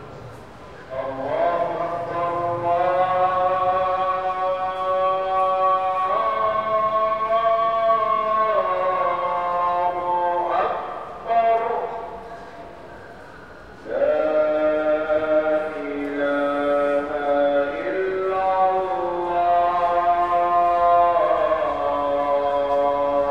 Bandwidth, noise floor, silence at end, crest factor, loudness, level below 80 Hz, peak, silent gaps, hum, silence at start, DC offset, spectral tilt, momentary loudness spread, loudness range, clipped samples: 8.2 kHz; -41 dBFS; 0 s; 14 dB; -21 LUFS; -54 dBFS; -8 dBFS; none; none; 0 s; 0.3%; -6.5 dB/octave; 13 LU; 5 LU; under 0.1%